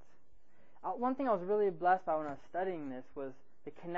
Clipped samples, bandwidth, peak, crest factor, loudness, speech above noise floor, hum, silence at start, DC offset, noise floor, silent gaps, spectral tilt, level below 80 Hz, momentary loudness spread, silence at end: under 0.1%; 6.8 kHz; -18 dBFS; 18 dB; -36 LUFS; 35 dB; none; 0.85 s; 0.4%; -71 dBFS; none; -5.5 dB/octave; -74 dBFS; 16 LU; 0 s